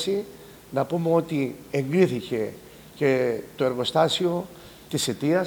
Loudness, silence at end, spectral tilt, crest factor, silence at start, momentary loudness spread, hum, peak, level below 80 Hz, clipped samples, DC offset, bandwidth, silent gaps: -25 LUFS; 0 s; -5.5 dB/octave; 18 dB; 0 s; 10 LU; none; -6 dBFS; -60 dBFS; under 0.1%; under 0.1%; over 20 kHz; none